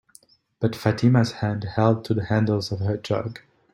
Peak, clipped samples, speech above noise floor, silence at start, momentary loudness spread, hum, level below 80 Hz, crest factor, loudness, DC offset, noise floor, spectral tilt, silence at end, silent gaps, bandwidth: -4 dBFS; under 0.1%; 34 dB; 0.6 s; 8 LU; none; -56 dBFS; 18 dB; -23 LUFS; under 0.1%; -56 dBFS; -7.5 dB/octave; 0.35 s; none; 13 kHz